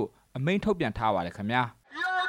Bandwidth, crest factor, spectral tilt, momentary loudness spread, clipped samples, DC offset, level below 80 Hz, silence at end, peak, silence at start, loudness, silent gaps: 13 kHz; 18 dB; -6.5 dB/octave; 6 LU; under 0.1%; under 0.1%; -52 dBFS; 0 s; -12 dBFS; 0 s; -29 LUFS; none